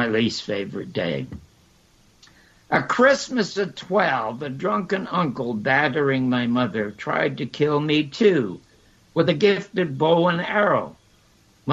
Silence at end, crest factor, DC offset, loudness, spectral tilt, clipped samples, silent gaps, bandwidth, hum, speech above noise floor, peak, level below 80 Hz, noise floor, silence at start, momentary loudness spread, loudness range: 0 s; 18 dB; under 0.1%; -22 LUFS; -5.5 dB/octave; under 0.1%; none; 8.2 kHz; none; 35 dB; -4 dBFS; -60 dBFS; -57 dBFS; 0 s; 10 LU; 3 LU